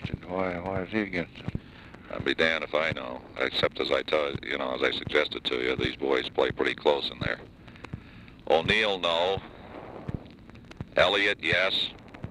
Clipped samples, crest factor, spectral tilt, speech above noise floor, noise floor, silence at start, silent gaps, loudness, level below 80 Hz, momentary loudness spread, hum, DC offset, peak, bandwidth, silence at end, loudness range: under 0.1%; 20 dB; -5 dB/octave; 21 dB; -48 dBFS; 0 s; none; -27 LUFS; -52 dBFS; 19 LU; none; under 0.1%; -8 dBFS; 12 kHz; 0 s; 2 LU